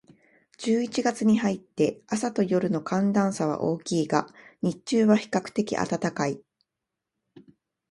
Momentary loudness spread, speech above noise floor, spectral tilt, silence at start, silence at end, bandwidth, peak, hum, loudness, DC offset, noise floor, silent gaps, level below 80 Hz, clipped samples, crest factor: 8 LU; 61 dB; -6 dB/octave; 0.6 s; 1.5 s; 11.5 kHz; -6 dBFS; none; -26 LUFS; under 0.1%; -86 dBFS; none; -66 dBFS; under 0.1%; 20 dB